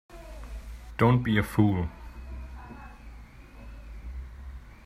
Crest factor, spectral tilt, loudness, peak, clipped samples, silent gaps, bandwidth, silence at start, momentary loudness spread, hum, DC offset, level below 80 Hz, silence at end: 22 dB; -8 dB/octave; -25 LUFS; -8 dBFS; under 0.1%; none; 15 kHz; 0.1 s; 24 LU; none; under 0.1%; -42 dBFS; 0 s